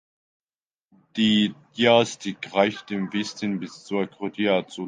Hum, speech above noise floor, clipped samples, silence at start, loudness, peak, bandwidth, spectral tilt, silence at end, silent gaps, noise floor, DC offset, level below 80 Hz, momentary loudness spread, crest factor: none; over 67 dB; under 0.1%; 1.15 s; -24 LUFS; -4 dBFS; 9.6 kHz; -5 dB/octave; 0 s; none; under -90 dBFS; under 0.1%; -66 dBFS; 11 LU; 20 dB